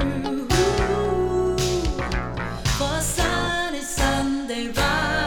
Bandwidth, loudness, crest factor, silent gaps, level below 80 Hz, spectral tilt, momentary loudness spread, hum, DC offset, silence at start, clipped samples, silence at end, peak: 19.5 kHz; -23 LUFS; 16 dB; none; -32 dBFS; -4 dB/octave; 6 LU; none; under 0.1%; 0 s; under 0.1%; 0 s; -6 dBFS